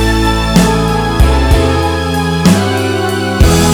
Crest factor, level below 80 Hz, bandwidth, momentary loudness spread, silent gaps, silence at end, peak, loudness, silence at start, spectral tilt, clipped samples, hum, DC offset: 10 dB; -16 dBFS; over 20 kHz; 4 LU; none; 0 s; 0 dBFS; -11 LUFS; 0 s; -5.5 dB/octave; 0.5%; none; under 0.1%